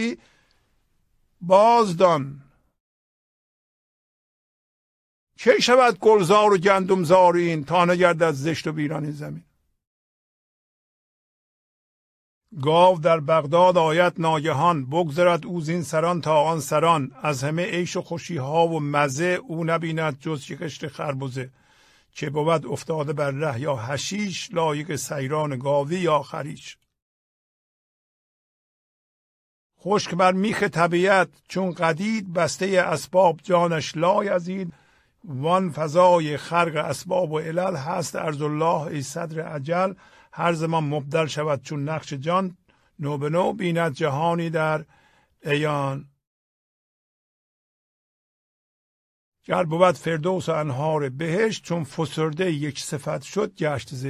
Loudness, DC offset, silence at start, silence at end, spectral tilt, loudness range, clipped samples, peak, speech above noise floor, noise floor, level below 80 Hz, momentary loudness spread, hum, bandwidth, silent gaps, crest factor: -22 LUFS; under 0.1%; 0 s; 0 s; -5.5 dB/octave; 9 LU; under 0.1%; -2 dBFS; 45 dB; -66 dBFS; -64 dBFS; 13 LU; none; 14.5 kHz; 2.80-5.27 s, 9.87-12.41 s, 27.02-29.70 s, 46.27-49.32 s; 20 dB